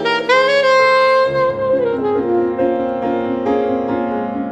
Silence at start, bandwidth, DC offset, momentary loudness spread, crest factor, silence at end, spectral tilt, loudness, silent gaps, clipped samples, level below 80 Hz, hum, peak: 0 s; 8.8 kHz; under 0.1%; 8 LU; 12 dB; 0 s; -5 dB/octave; -15 LUFS; none; under 0.1%; -50 dBFS; none; -2 dBFS